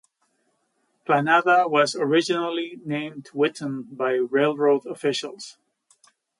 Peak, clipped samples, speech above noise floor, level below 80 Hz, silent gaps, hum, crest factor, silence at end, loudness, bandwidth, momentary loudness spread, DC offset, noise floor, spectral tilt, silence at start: -6 dBFS; under 0.1%; 48 dB; -76 dBFS; none; none; 18 dB; 0.9 s; -23 LUFS; 11.5 kHz; 14 LU; under 0.1%; -71 dBFS; -4.5 dB/octave; 1.1 s